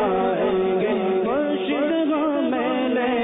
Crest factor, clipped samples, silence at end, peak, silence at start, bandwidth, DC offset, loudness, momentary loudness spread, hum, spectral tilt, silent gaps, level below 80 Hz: 8 dB; under 0.1%; 0 s; -12 dBFS; 0 s; 4 kHz; under 0.1%; -22 LUFS; 1 LU; none; -10.5 dB/octave; none; -58 dBFS